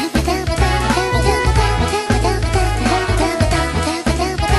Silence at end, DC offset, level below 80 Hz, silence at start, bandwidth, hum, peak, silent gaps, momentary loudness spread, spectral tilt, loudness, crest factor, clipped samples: 0 s; under 0.1%; -22 dBFS; 0 s; 12.5 kHz; none; -2 dBFS; none; 3 LU; -5 dB/octave; -17 LUFS; 14 dB; under 0.1%